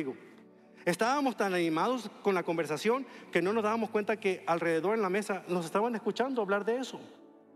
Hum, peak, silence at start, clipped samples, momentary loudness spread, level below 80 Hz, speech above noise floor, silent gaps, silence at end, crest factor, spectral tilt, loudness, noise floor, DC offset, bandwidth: none; -12 dBFS; 0 s; under 0.1%; 5 LU; -84 dBFS; 25 dB; none; 0.4 s; 20 dB; -5 dB/octave; -31 LUFS; -56 dBFS; under 0.1%; 15 kHz